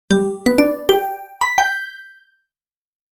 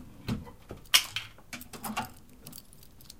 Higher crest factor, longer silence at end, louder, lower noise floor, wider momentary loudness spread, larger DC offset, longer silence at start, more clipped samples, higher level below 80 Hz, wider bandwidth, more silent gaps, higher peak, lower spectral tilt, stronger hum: second, 20 dB vs 32 dB; first, 1.05 s vs 0.05 s; first, -17 LUFS vs -30 LUFS; first, under -90 dBFS vs -54 dBFS; second, 12 LU vs 24 LU; second, under 0.1% vs 0.2%; about the same, 0.1 s vs 0 s; neither; first, -48 dBFS vs -54 dBFS; first, 19 kHz vs 17 kHz; neither; first, 0 dBFS vs -4 dBFS; first, -4.5 dB/octave vs -1.5 dB/octave; neither